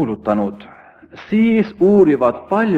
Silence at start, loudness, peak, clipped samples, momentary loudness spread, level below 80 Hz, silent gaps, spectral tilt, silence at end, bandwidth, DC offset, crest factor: 0 s; -15 LUFS; -2 dBFS; under 0.1%; 8 LU; -52 dBFS; none; -9 dB/octave; 0 s; 5.4 kHz; under 0.1%; 14 dB